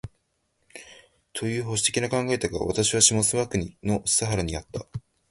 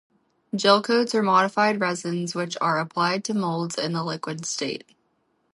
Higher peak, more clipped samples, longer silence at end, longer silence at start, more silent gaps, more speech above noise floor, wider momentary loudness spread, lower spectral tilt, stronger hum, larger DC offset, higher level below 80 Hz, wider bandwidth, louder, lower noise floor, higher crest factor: about the same, -2 dBFS vs -4 dBFS; neither; second, 0.3 s vs 0.75 s; second, 0.05 s vs 0.55 s; neither; about the same, 47 dB vs 46 dB; first, 21 LU vs 10 LU; about the same, -3 dB/octave vs -4 dB/octave; neither; neither; first, -46 dBFS vs -76 dBFS; about the same, 12 kHz vs 11.5 kHz; about the same, -24 LUFS vs -23 LUFS; about the same, -72 dBFS vs -70 dBFS; about the same, 24 dB vs 20 dB